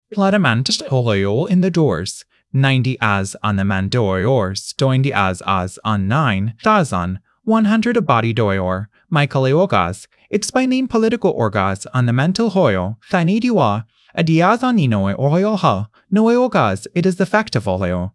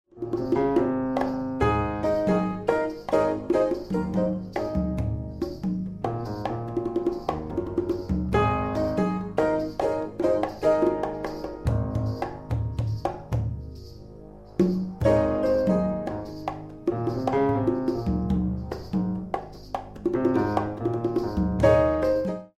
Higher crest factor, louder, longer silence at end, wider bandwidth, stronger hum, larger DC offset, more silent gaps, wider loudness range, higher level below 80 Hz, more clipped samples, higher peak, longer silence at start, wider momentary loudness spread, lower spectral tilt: about the same, 16 dB vs 18 dB; first, -17 LUFS vs -26 LUFS; about the same, 0.05 s vs 0.1 s; second, 12 kHz vs 13.5 kHz; neither; second, under 0.1% vs 0.1%; neither; second, 1 LU vs 4 LU; second, -54 dBFS vs -40 dBFS; neither; first, 0 dBFS vs -6 dBFS; about the same, 0.1 s vs 0.15 s; second, 6 LU vs 10 LU; second, -6 dB/octave vs -8.5 dB/octave